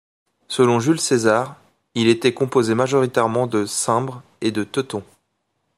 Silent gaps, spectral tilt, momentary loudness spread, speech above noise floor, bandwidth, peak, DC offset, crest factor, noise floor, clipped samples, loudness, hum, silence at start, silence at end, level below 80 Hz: none; -4.5 dB/octave; 12 LU; 53 dB; 15 kHz; -2 dBFS; under 0.1%; 18 dB; -72 dBFS; under 0.1%; -19 LUFS; none; 0.5 s; 0.75 s; -64 dBFS